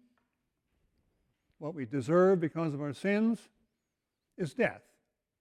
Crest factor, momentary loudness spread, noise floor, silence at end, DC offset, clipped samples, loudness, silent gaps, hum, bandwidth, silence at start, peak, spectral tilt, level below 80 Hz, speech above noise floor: 18 dB; 14 LU; -86 dBFS; 0.65 s; under 0.1%; under 0.1%; -31 LUFS; none; none; 11.5 kHz; 1.6 s; -16 dBFS; -7.5 dB/octave; -74 dBFS; 56 dB